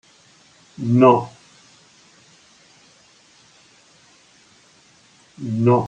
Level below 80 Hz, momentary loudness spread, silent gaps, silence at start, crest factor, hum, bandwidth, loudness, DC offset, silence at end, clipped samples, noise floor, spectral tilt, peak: -68 dBFS; 20 LU; none; 0.8 s; 22 dB; none; 9 kHz; -18 LUFS; under 0.1%; 0 s; under 0.1%; -53 dBFS; -8.5 dB/octave; -2 dBFS